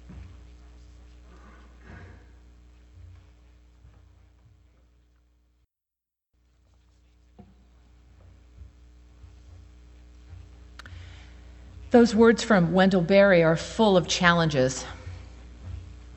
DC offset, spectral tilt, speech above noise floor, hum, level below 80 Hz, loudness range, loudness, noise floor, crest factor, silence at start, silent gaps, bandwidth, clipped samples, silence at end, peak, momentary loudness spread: under 0.1%; -5.5 dB/octave; 69 dB; 60 Hz at -55 dBFS; -48 dBFS; 5 LU; -21 LUFS; -89 dBFS; 24 dB; 0.1 s; none; 8.4 kHz; under 0.1%; 0 s; -4 dBFS; 28 LU